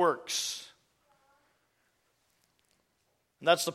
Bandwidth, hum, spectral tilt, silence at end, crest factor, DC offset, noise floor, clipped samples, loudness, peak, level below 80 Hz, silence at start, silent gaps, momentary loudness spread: 16.5 kHz; none; -2 dB/octave; 0 s; 26 dB; under 0.1%; -76 dBFS; under 0.1%; -31 LUFS; -10 dBFS; -82 dBFS; 0 s; none; 15 LU